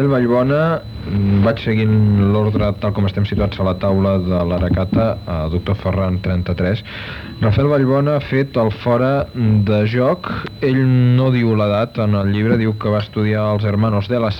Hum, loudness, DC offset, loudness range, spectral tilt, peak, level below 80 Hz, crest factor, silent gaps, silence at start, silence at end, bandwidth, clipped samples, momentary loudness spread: none; -17 LUFS; under 0.1%; 2 LU; -9.5 dB/octave; -2 dBFS; -36 dBFS; 14 dB; none; 0 s; 0 s; 5.6 kHz; under 0.1%; 6 LU